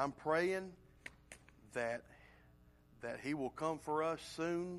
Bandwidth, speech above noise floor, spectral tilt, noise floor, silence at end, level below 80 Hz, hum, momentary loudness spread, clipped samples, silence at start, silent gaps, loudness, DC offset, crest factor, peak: 13.5 kHz; 26 dB; -5.5 dB/octave; -66 dBFS; 0 s; -70 dBFS; 60 Hz at -70 dBFS; 19 LU; under 0.1%; 0 s; none; -40 LUFS; under 0.1%; 20 dB; -22 dBFS